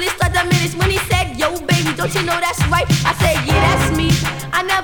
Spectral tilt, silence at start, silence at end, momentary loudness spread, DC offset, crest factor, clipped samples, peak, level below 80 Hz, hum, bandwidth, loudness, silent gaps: -4.5 dB/octave; 0 s; 0 s; 4 LU; 0.9%; 16 dB; under 0.1%; 0 dBFS; -28 dBFS; none; over 20 kHz; -16 LUFS; none